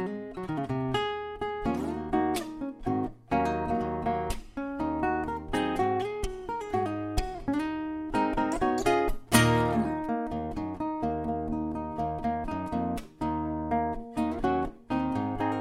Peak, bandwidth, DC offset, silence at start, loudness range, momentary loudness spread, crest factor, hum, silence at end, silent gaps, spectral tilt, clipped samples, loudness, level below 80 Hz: -8 dBFS; 16 kHz; under 0.1%; 0 s; 4 LU; 8 LU; 22 dB; none; 0 s; none; -5.5 dB/octave; under 0.1%; -30 LUFS; -42 dBFS